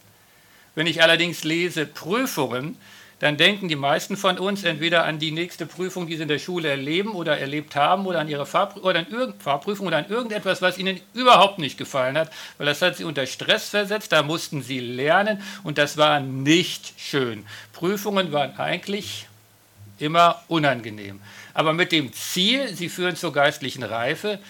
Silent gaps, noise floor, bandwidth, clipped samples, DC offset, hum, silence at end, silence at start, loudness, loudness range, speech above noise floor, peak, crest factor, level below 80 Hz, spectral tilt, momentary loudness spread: none; -54 dBFS; 18 kHz; under 0.1%; under 0.1%; none; 0 s; 0.75 s; -22 LUFS; 3 LU; 31 dB; -4 dBFS; 20 dB; -72 dBFS; -4 dB/octave; 11 LU